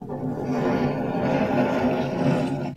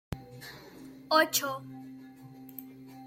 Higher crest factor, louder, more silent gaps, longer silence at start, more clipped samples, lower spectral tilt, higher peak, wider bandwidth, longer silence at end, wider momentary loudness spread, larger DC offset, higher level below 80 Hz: second, 14 dB vs 24 dB; first, -24 LUFS vs -28 LUFS; neither; about the same, 0 s vs 0.1 s; neither; first, -8 dB/octave vs -2.5 dB/octave; about the same, -10 dBFS vs -12 dBFS; second, 13 kHz vs 16.5 kHz; about the same, 0 s vs 0 s; second, 4 LU vs 24 LU; neither; first, -52 dBFS vs -60 dBFS